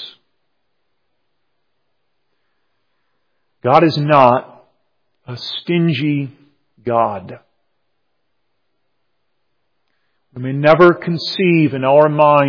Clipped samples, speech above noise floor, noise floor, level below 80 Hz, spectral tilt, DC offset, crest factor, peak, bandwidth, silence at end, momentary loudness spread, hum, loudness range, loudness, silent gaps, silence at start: 0.2%; 59 dB; -72 dBFS; -60 dBFS; -8 dB/octave; under 0.1%; 18 dB; 0 dBFS; 5.4 kHz; 0 s; 18 LU; none; 10 LU; -14 LUFS; none; 0 s